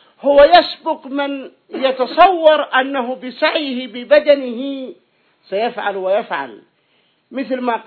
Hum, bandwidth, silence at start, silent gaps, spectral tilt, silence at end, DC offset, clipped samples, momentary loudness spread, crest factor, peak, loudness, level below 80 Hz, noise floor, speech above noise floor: none; 5.4 kHz; 0.25 s; none; -6 dB/octave; 0.05 s; under 0.1%; under 0.1%; 16 LU; 16 dB; 0 dBFS; -15 LUFS; -52 dBFS; -60 dBFS; 45 dB